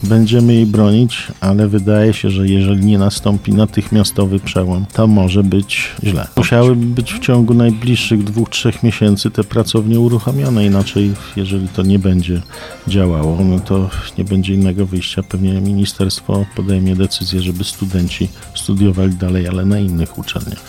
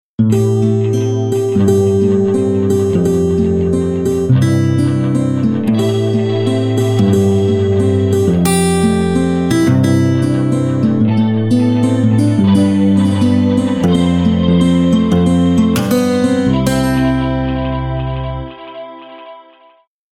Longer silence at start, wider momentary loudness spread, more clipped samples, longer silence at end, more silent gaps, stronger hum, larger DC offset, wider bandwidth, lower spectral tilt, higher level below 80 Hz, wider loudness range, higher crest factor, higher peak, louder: second, 0 s vs 0.2 s; first, 8 LU vs 4 LU; neither; second, 0 s vs 0.7 s; neither; neither; neither; about the same, 16 kHz vs 17 kHz; about the same, -6.5 dB/octave vs -7 dB/octave; about the same, -34 dBFS vs -34 dBFS; about the same, 4 LU vs 2 LU; about the same, 12 dB vs 12 dB; about the same, -2 dBFS vs 0 dBFS; about the same, -14 LUFS vs -13 LUFS